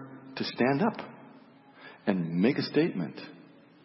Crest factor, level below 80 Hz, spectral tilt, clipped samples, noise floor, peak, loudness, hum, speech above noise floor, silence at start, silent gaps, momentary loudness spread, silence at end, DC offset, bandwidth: 20 dB; -76 dBFS; -10 dB/octave; under 0.1%; -55 dBFS; -10 dBFS; -29 LUFS; none; 26 dB; 0 s; none; 19 LU; 0.45 s; under 0.1%; 5.8 kHz